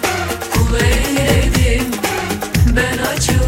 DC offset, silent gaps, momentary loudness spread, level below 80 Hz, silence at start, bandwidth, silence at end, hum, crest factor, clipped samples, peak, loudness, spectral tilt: under 0.1%; none; 5 LU; -20 dBFS; 0 s; 16.5 kHz; 0 s; none; 14 dB; under 0.1%; 0 dBFS; -15 LUFS; -4.5 dB/octave